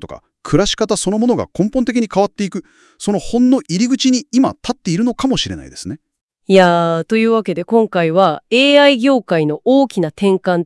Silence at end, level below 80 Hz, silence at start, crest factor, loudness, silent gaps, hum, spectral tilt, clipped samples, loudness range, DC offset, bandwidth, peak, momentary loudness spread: 0 s; -42 dBFS; 0 s; 14 dB; -14 LUFS; 6.21-6.28 s; none; -5 dB/octave; under 0.1%; 4 LU; under 0.1%; 12 kHz; 0 dBFS; 13 LU